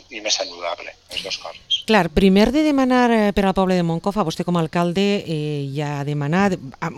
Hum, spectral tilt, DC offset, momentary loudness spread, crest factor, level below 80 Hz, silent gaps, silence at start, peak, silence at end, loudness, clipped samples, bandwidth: none; -5.5 dB/octave; under 0.1%; 12 LU; 18 dB; -40 dBFS; none; 0.1 s; 0 dBFS; 0 s; -19 LUFS; under 0.1%; 13 kHz